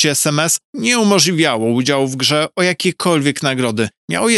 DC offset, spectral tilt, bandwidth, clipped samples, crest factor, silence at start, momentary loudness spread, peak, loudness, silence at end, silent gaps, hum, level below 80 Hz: under 0.1%; -3.5 dB/octave; 15.5 kHz; under 0.1%; 14 dB; 0 s; 6 LU; 0 dBFS; -15 LUFS; 0 s; 0.65-0.73 s, 3.97-4.08 s; none; -64 dBFS